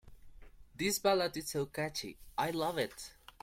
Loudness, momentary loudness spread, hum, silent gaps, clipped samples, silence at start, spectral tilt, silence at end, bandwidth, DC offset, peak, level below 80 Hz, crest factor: -35 LUFS; 11 LU; none; none; under 0.1%; 0.05 s; -3.5 dB/octave; 0.3 s; 16.5 kHz; under 0.1%; -16 dBFS; -60 dBFS; 20 dB